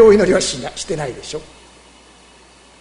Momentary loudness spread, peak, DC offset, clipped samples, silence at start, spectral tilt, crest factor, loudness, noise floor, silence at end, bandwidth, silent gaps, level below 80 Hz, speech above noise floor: 18 LU; 0 dBFS; under 0.1%; under 0.1%; 0 s; -4 dB/octave; 18 dB; -18 LUFS; -46 dBFS; 1.4 s; 11 kHz; none; -42 dBFS; 30 dB